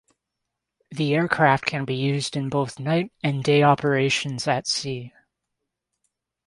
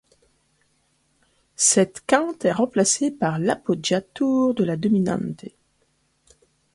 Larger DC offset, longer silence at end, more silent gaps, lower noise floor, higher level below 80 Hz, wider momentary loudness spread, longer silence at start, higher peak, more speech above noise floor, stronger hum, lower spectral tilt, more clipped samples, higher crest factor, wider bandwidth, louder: neither; first, 1.4 s vs 1.25 s; neither; first, -82 dBFS vs -67 dBFS; about the same, -62 dBFS vs -62 dBFS; about the same, 8 LU vs 7 LU; second, 0.9 s vs 1.6 s; about the same, -2 dBFS vs -2 dBFS; first, 60 dB vs 46 dB; neither; about the same, -5 dB/octave vs -4 dB/octave; neither; about the same, 22 dB vs 22 dB; about the same, 11.5 kHz vs 11.5 kHz; about the same, -22 LUFS vs -21 LUFS